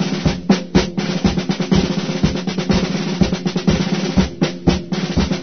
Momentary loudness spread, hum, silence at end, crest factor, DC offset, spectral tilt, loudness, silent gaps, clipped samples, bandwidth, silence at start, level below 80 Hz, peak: 4 LU; none; 0 s; 18 dB; 0.9%; -6 dB/octave; -18 LUFS; none; under 0.1%; 6.6 kHz; 0 s; -30 dBFS; 0 dBFS